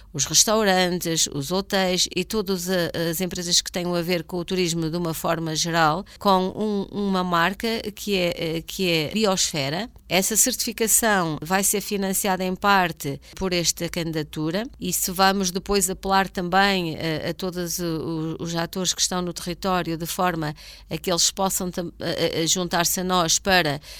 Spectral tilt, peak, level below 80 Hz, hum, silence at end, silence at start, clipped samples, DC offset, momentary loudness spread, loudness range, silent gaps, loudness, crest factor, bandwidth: -3 dB/octave; -4 dBFS; -48 dBFS; none; 0 s; 0 s; under 0.1%; under 0.1%; 9 LU; 3 LU; none; -22 LUFS; 20 dB; 17.5 kHz